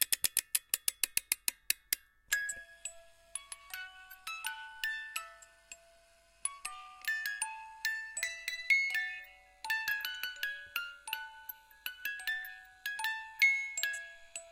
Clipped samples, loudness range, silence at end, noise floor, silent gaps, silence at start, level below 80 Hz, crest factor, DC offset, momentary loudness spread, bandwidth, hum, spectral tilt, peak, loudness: under 0.1%; 8 LU; 0 s; -65 dBFS; none; 0 s; -72 dBFS; 28 dB; under 0.1%; 17 LU; 16.5 kHz; none; 3.5 dB/octave; -10 dBFS; -35 LUFS